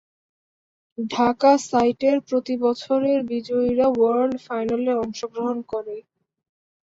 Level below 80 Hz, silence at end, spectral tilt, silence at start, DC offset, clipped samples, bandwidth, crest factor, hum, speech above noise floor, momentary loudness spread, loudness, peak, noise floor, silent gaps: -60 dBFS; 0.85 s; -5 dB/octave; 1 s; under 0.1%; under 0.1%; 8 kHz; 16 dB; none; over 69 dB; 12 LU; -22 LUFS; -6 dBFS; under -90 dBFS; none